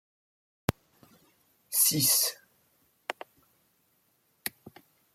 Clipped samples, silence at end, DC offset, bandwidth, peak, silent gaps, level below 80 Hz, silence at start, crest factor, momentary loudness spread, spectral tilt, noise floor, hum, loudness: under 0.1%; 0.45 s; under 0.1%; 16.5 kHz; -6 dBFS; none; -62 dBFS; 0.7 s; 28 dB; 22 LU; -2 dB/octave; -71 dBFS; none; -27 LUFS